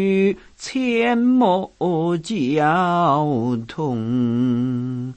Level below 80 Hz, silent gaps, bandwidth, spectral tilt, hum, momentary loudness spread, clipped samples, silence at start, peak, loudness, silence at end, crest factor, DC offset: -56 dBFS; none; 8.6 kHz; -7 dB/octave; none; 8 LU; under 0.1%; 0 s; -4 dBFS; -20 LUFS; 0.05 s; 14 dB; under 0.1%